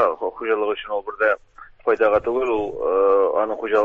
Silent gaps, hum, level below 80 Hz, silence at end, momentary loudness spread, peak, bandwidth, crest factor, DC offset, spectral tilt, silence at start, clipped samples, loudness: none; none; -54 dBFS; 0 s; 9 LU; -4 dBFS; 7 kHz; 16 dB; under 0.1%; -6 dB/octave; 0 s; under 0.1%; -21 LUFS